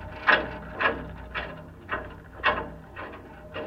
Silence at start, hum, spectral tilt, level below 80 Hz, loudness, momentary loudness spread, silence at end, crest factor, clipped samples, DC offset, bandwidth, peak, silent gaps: 0 s; none; -6 dB/octave; -48 dBFS; -28 LUFS; 19 LU; 0 s; 26 dB; under 0.1%; under 0.1%; 15.5 kHz; -6 dBFS; none